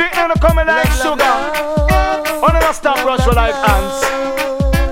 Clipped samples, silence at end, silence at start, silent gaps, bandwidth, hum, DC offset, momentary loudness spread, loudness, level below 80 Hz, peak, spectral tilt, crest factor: under 0.1%; 0 s; 0 s; none; 16.5 kHz; none; under 0.1%; 4 LU; -14 LUFS; -20 dBFS; 0 dBFS; -5 dB/octave; 14 dB